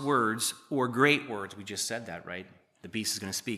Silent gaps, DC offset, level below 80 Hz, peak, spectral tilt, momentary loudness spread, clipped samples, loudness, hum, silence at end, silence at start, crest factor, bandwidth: none; under 0.1%; -76 dBFS; -10 dBFS; -3 dB/octave; 15 LU; under 0.1%; -30 LUFS; none; 0 s; 0 s; 22 dB; 15 kHz